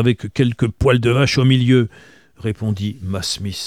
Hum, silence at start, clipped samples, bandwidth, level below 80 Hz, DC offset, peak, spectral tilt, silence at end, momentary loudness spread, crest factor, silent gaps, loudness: none; 0 s; under 0.1%; 13.5 kHz; -38 dBFS; 0.2%; -2 dBFS; -6 dB/octave; 0 s; 10 LU; 16 dB; none; -18 LUFS